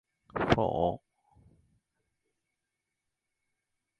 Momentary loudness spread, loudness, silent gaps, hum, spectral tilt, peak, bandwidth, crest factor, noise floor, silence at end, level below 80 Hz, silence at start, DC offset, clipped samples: 15 LU; -30 LUFS; none; none; -7 dB/octave; -6 dBFS; 10 kHz; 30 dB; -86 dBFS; 3 s; -54 dBFS; 0.35 s; under 0.1%; under 0.1%